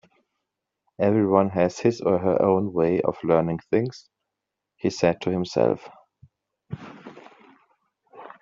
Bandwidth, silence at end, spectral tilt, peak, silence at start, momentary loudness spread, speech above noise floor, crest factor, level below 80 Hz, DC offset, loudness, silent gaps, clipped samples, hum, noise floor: 7.6 kHz; 0.15 s; -6.5 dB/octave; -4 dBFS; 1 s; 18 LU; 62 dB; 22 dB; -62 dBFS; under 0.1%; -23 LUFS; none; under 0.1%; none; -84 dBFS